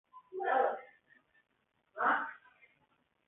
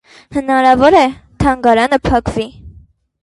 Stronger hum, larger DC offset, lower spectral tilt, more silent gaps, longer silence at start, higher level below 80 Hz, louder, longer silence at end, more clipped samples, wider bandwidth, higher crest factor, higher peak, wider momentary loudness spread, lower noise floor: neither; neither; second, 5.5 dB/octave vs -6 dB/octave; neither; second, 0.15 s vs 0.3 s; second, -86 dBFS vs -32 dBFS; second, -34 LUFS vs -13 LUFS; first, 0.9 s vs 0.55 s; neither; second, 3.9 kHz vs 11.5 kHz; first, 20 dB vs 14 dB; second, -18 dBFS vs 0 dBFS; first, 19 LU vs 13 LU; first, -75 dBFS vs -44 dBFS